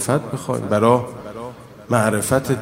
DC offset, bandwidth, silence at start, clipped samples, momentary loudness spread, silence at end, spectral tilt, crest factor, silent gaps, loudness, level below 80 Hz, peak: under 0.1%; 16 kHz; 0 s; under 0.1%; 17 LU; 0 s; -5.5 dB/octave; 20 dB; none; -19 LUFS; -50 dBFS; 0 dBFS